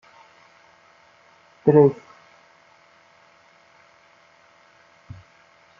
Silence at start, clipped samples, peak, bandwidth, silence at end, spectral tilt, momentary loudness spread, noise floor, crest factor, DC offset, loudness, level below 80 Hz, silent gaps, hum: 1.65 s; under 0.1%; -2 dBFS; 6.8 kHz; 3.85 s; -9 dB/octave; 30 LU; -55 dBFS; 24 dB; under 0.1%; -18 LUFS; -68 dBFS; none; none